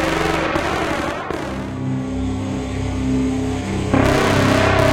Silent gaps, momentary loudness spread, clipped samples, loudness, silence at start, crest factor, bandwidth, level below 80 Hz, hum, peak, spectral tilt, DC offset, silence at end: none; 9 LU; under 0.1%; -19 LUFS; 0 s; 16 dB; 17 kHz; -32 dBFS; none; -2 dBFS; -5.5 dB/octave; under 0.1%; 0 s